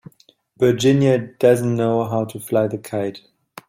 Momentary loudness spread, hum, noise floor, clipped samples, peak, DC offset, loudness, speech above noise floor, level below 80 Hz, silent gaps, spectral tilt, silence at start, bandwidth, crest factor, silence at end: 10 LU; none; -56 dBFS; under 0.1%; -2 dBFS; under 0.1%; -19 LUFS; 38 dB; -58 dBFS; none; -6.5 dB/octave; 0.6 s; 16.5 kHz; 16 dB; 0.5 s